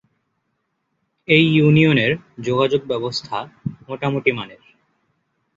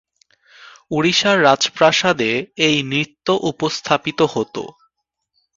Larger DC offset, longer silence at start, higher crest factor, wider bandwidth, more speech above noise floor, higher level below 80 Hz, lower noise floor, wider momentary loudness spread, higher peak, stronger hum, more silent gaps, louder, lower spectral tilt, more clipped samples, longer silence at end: neither; first, 1.3 s vs 0.6 s; about the same, 18 dB vs 18 dB; about the same, 7.6 kHz vs 7.8 kHz; about the same, 54 dB vs 56 dB; about the same, -56 dBFS vs -58 dBFS; about the same, -72 dBFS vs -74 dBFS; first, 17 LU vs 11 LU; about the same, -2 dBFS vs 0 dBFS; neither; neither; about the same, -18 LUFS vs -17 LUFS; first, -7 dB/octave vs -3.5 dB/octave; neither; first, 1.05 s vs 0.9 s